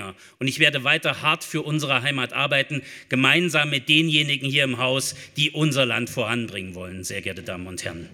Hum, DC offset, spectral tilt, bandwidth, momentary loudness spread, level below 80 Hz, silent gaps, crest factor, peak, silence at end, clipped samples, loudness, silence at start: none; under 0.1%; -3.5 dB/octave; 17.5 kHz; 14 LU; -66 dBFS; none; 24 dB; 0 dBFS; 0 s; under 0.1%; -21 LUFS; 0 s